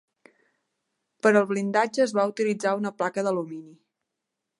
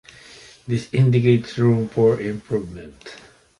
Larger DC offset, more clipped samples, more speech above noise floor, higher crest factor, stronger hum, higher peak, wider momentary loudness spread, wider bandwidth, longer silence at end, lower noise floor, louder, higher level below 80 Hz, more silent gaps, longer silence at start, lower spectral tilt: neither; neither; first, 60 dB vs 26 dB; about the same, 20 dB vs 18 dB; neither; about the same, -6 dBFS vs -4 dBFS; second, 8 LU vs 22 LU; about the same, 11.5 kHz vs 11 kHz; first, 0.9 s vs 0.45 s; first, -84 dBFS vs -45 dBFS; second, -25 LUFS vs -20 LUFS; second, -80 dBFS vs -52 dBFS; neither; first, 1.25 s vs 0.65 s; second, -5.5 dB/octave vs -8 dB/octave